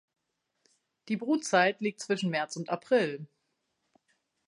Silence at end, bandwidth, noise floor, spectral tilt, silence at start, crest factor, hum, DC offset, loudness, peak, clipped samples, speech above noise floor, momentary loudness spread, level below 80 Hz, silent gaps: 1.25 s; 11.5 kHz; -80 dBFS; -4.5 dB/octave; 1.05 s; 22 dB; none; under 0.1%; -29 LUFS; -10 dBFS; under 0.1%; 50 dB; 10 LU; -84 dBFS; none